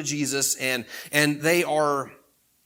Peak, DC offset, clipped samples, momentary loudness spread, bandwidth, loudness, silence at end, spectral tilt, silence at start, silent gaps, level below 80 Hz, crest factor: -2 dBFS; under 0.1%; under 0.1%; 8 LU; 19 kHz; -23 LUFS; 0.5 s; -3 dB/octave; 0 s; none; -72 dBFS; 22 dB